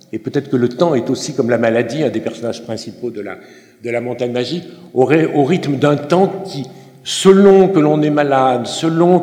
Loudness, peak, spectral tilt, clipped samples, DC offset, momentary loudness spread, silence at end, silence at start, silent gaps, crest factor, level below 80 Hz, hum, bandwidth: -15 LUFS; 0 dBFS; -6 dB/octave; 0.1%; under 0.1%; 16 LU; 0 s; 0.15 s; none; 14 dB; -60 dBFS; none; 12 kHz